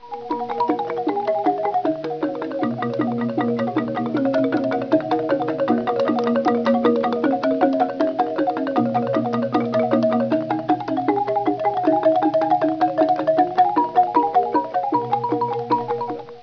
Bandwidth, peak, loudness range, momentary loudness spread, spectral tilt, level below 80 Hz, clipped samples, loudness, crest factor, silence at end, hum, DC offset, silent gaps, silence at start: 5.4 kHz; -4 dBFS; 4 LU; 6 LU; -8 dB/octave; -62 dBFS; under 0.1%; -21 LUFS; 16 dB; 0 s; none; under 0.1%; none; 0 s